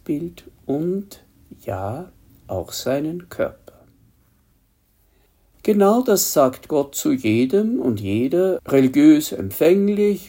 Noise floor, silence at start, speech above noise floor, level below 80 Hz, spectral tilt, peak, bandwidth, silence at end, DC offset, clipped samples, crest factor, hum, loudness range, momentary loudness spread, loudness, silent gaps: -61 dBFS; 0.1 s; 42 dB; -56 dBFS; -5.5 dB/octave; -2 dBFS; 16.5 kHz; 0 s; under 0.1%; under 0.1%; 18 dB; none; 12 LU; 15 LU; -19 LUFS; none